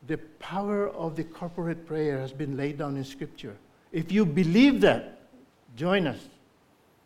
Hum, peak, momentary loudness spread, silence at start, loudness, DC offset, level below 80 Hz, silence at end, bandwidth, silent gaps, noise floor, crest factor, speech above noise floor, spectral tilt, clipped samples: none; -8 dBFS; 19 LU; 0.05 s; -27 LUFS; under 0.1%; -56 dBFS; 0.75 s; 13.5 kHz; none; -62 dBFS; 20 dB; 36 dB; -7 dB/octave; under 0.1%